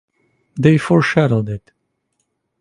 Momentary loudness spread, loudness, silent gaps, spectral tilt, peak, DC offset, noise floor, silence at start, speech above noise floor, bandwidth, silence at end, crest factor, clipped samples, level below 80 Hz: 16 LU; -15 LUFS; none; -7.5 dB/octave; 0 dBFS; under 0.1%; -70 dBFS; 0.55 s; 56 dB; 11 kHz; 1 s; 18 dB; under 0.1%; -50 dBFS